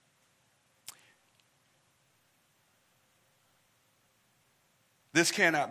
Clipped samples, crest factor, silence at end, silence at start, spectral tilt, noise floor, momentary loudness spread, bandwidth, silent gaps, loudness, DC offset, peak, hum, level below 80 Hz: under 0.1%; 28 dB; 0 s; 5.15 s; -2.5 dB/octave; -71 dBFS; 25 LU; 16 kHz; none; -27 LUFS; under 0.1%; -10 dBFS; none; -86 dBFS